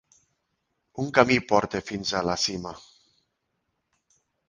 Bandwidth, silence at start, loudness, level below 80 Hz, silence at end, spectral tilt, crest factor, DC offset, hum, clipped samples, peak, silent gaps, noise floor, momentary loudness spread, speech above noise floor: 10 kHz; 0.95 s; -25 LUFS; -56 dBFS; 1.7 s; -4 dB/octave; 28 dB; under 0.1%; none; under 0.1%; -2 dBFS; none; -78 dBFS; 19 LU; 53 dB